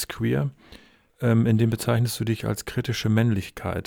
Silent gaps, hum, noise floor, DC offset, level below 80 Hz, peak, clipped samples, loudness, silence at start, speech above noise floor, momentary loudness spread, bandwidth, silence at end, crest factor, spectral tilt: none; none; -51 dBFS; under 0.1%; -50 dBFS; -8 dBFS; under 0.1%; -24 LUFS; 0 s; 28 dB; 7 LU; 18 kHz; 0.05 s; 16 dB; -6.5 dB/octave